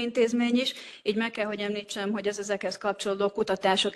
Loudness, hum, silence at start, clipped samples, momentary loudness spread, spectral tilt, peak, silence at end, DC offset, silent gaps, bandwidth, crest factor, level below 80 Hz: -28 LUFS; none; 0 s; under 0.1%; 7 LU; -4 dB/octave; -10 dBFS; 0 s; under 0.1%; none; 12.5 kHz; 18 dB; -70 dBFS